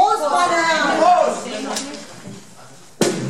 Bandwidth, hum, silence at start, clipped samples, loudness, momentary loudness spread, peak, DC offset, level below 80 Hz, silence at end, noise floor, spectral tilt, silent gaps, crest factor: 16 kHz; none; 0 s; under 0.1%; -17 LUFS; 21 LU; -4 dBFS; 0.5%; -62 dBFS; 0 s; -44 dBFS; -3 dB/octave; none; 16 dB